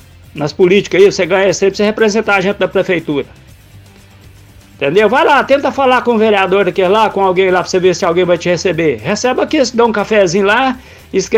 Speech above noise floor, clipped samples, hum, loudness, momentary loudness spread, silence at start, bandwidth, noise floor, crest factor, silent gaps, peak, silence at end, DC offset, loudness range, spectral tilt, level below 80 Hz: 28 dB; 0.1%; none; -12 LUFS; 8 LU; 0.35 s; 14 kHz; -39 dBFS; 12 dB; none; 0 dBFS; 0 s; under 0.1%; 4 LU; -4.5 dB/octave; -44 dBFS